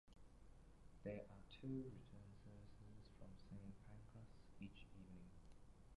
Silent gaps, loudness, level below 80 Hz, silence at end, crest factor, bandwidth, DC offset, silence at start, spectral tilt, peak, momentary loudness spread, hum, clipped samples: none; -59 LUFS; -68 dBFS; 0 s; 20 dB; 11 kHz; under 0.1%; 0.05 s; -7.5 dB/octave; -38 dBFS; 16 LU; none; under 0.1%